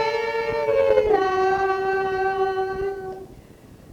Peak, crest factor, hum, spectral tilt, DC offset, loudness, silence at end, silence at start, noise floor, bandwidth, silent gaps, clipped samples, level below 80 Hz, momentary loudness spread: -4 dBFS; 18 dB; none; -5.5 dB/octave; under 0.1%; -22 LUFS; 0 s; 0 s; -46 dBFS; 10 kHz; none; under 0.1%; -48 dBFS; 10 LU